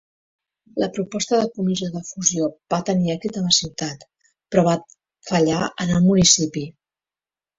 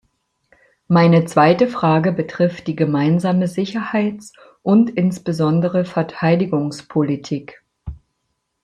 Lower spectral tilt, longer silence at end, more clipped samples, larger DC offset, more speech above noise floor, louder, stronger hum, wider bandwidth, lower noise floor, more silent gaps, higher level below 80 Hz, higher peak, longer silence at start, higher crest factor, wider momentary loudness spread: second, -4 dB/octave vs -7.5 dB/octave; first, 0.9 s vs 0.7 s; neither; neither; first, over 70 dB vs 56 dB; about the same, -20 LUFS vs -18 LUFS; neither; second, 8 kHz vs 11 kHz; first, under -90 dBFS vs -72 dBFS; neither; about the same, -52 dBFS vs -50 dBFS; about the same, 0 dBFS vs -2 dBFS; second, 0.75 s vs 0.9 s; first, 22 dB vs 16 dB; about the same, 15 LU vs 14 LU